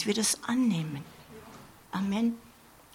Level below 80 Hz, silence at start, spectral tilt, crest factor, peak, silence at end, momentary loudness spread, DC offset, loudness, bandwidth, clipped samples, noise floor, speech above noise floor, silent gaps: -66 dBFS; 0 s; -4 dB/octave; 16 dB; -16 dBFS; 0.45 s; 22 LU; under 0.1%; -30 LUFS; 16.5 kHz; under 0.1%; -51 dBFS; 22 dB; none